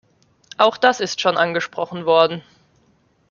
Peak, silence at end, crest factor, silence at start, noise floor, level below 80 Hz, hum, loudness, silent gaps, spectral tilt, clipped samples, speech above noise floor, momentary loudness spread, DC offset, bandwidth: 0 dBFS; 0.9 s; 20 dB; 0.6 s; -60 dBFS; -68 dBFS; none; -18 LUFS; none; -3.5 dB/octave; under 0.1%; 42 dB; 10 LU; under 0.1%; 7.2 kHz